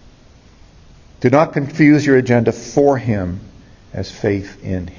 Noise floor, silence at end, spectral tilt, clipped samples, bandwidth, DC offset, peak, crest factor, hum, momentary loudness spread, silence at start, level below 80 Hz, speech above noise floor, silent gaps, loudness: -45 dBFS; 0.05 s; -7 dB/octave; under 0.1%; 7.4 kHz; under 0.1%; 0 dBFS; 16 dB; none; 15 LU; 1.2 s; -40 dBFS; 30 dB; none; -16 LUFS